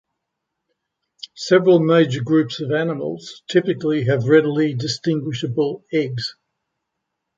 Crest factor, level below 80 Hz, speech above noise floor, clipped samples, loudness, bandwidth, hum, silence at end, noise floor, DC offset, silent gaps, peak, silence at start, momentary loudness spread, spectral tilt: 18 dB; -62 dBFS; 61 dB; under 0.1%; -19 LUFS; 7.8 kHz; none; 1.05 s; -79 dBFS; under 0.1%; none; -2 dBFS; 1.35 s; 14 LU; -6.5 dB/octave